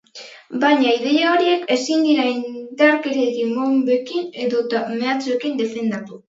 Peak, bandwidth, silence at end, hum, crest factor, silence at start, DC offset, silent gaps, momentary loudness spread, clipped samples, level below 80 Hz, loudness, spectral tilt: 0 dBFS; 7.8 kHz; 0.2 s; none; 18 dB; 0.15 s; under 0.1%; none; 10 LU; under 0.1%; -74 dBFS; -19 LUFS; -4 dB/octave